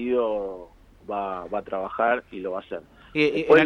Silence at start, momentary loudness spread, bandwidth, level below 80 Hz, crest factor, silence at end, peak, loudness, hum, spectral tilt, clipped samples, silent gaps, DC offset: 0 s; 14 LU; 7 kHz; -56 dBFS; 18 dB; 0 s; -6 dBFS; -26 LUFS; none; -6.5 dB/octave; under 0.1%; none; under 0.1%